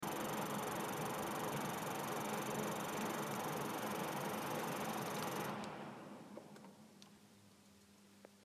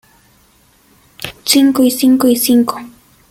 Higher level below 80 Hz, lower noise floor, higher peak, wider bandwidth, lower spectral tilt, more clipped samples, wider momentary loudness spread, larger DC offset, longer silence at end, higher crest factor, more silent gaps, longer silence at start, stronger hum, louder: second, -78 dBFS vs -54 dBFS; first, -65 dBFS vs -51 dBFS; second, -28 dBFS vs 0 dBFS; about the same, 15.5 kHz vs 17 kHz; about the same, -4 dB/octave vs -3 dB/octave; neither; about the same, 17 LU vs 18 LU; neither; second, 0 s vs 0.4 s; about the same, 16 dB vs 14 dB; neither; second, 0 s vs 1.2 s; neither; second, -42 LUFS vs -12 LUFS